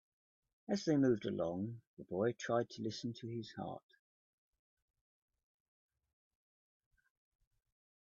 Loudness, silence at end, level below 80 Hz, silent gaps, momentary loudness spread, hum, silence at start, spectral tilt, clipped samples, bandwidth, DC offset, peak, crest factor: -39 LUFS; 4.3 s; -78 dBFS; 1.87-1.97 s; 15 LU; none; 0.7 s; -6 dB/octave; under 0.1%; 7.4 kHz; under 0.1%; -22 dBFS; 20 dB